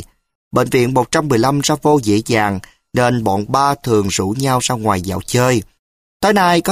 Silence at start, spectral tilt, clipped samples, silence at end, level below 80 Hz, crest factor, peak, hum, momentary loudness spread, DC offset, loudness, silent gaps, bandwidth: 0 s; -5 dB/octave; under 0.1%; 0 s; -44 dBFS; 14 dB; -2 dBFS; none; 5 LU; under 0.1%; -16 LUFS; 0.35-0.51 s, 5.79-6.20 s; 15.5 kHz